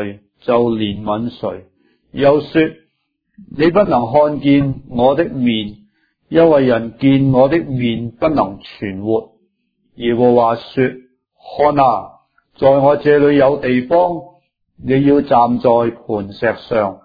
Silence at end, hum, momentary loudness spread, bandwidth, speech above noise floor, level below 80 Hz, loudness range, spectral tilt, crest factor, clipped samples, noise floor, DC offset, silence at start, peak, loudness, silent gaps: 0.1 s; none; 12 LU; 5 kHz; 54 dB; -46 dBFS; 4 LU; -10 dB/octave; 14 dB; under 0.1%; -68 dBFS; under 0.1%; 0 s; 0 dBFS; -15 LUFS; none